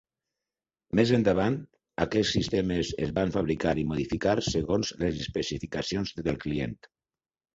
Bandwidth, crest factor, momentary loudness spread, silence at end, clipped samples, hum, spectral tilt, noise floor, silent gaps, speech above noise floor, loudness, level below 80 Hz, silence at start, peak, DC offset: 8 kHz; 20 dB; 8 LU; 0.8 s; under 0.1%; none; -5.5 dB/octave; under -90 dBFS; none; over 63 dB; -28 LUFS; -48 dBFS; 0.95 s; -8 dBFS; under 0.1%